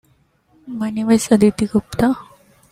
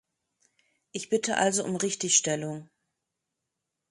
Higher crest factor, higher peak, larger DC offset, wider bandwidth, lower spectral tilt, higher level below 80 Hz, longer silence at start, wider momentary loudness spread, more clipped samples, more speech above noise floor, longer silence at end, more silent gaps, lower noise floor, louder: second, 16 dB vs 24 dB; first, -2 dBFS vs -8 dBFS; neither; first, 15 kHz vs 11.5 kHz; first, -6 dB/octave vs -2.5 dB/octave; first, -46 dBFS vs -74 dBFS; second, 0.65 s vs 0.95 s; second, 12 LU vs 16 LU; neither; second, 42 dB vs 57 dB; second, 0.5 s vs 1.25 s; neither; second, -59 dBFS vs -84 dBFS; first, -17 LUFS vs -26 LUFS